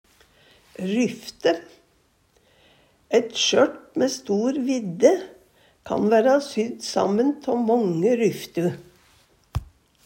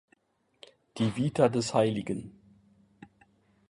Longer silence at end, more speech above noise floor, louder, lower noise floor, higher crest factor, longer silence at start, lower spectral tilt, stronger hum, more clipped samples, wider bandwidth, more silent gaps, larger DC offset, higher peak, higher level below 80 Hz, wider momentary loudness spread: second, 0.4 s vs 1.4 s; about the same, 42 dB vs 43 dB; first, -22 LUFS vs -28 LUFS; second, -63 dBFS vs -71 dBFS; about the same, 20 dB vs 22 dB; second, 0.8 s vs 0.95 s; second, -4.5 dB/octave vs -6 dB/octave; neither; neither; first, 16 kHz vs 11.5 kHz; neither; neither; first, -4 dBFS vs -10 dBFS; first, -52 dBFS vs -64 dBFS; second, 11 LU vs 17 LU